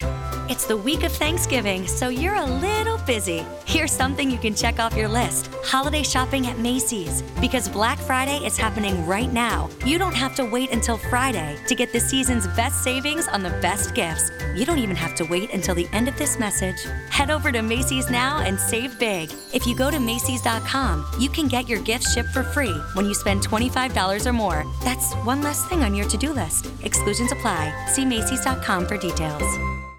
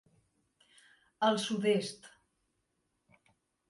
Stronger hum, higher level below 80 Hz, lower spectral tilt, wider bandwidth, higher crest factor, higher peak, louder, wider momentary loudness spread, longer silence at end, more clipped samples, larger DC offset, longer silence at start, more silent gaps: neither; first, -32 dBFS vs -82 dBFS; about the same, -3.5 dB/octave vs -4.5 dB/octave; first, 18.5 kHz vs 11.5 kHz; second, 16 dB vs 22 dB; first, -8 dBFS vs -16 dBFS; first, -22 LUFS vs -32 LUFS; second, 4 LU vs 13 LU; second, 0 s vs 1.6 s; neither; neither; second, 0 s vs 1.2 s; neither